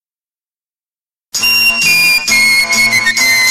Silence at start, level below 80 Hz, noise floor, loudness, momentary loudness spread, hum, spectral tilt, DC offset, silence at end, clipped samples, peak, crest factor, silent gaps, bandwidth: 1.35 s; -46 dBFS; under -90 dBFS; -8 LUFS; 3 LU; none; 1 dB/octave; under 0.1%; 0 s; under 0.1%; 0 dBFS; 12 dB; none; 16.5 kHz